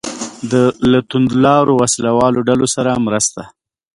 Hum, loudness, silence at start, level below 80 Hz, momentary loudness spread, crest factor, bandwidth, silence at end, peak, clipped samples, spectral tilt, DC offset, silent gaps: none; -14 LUFS; 0.05 s; -46 dBFS; 7 LU; 14 dB; 11.5 kHz; 0.45 s; 0 dBFS; under 0.1%; -5 dB/octave; under 0.1%; none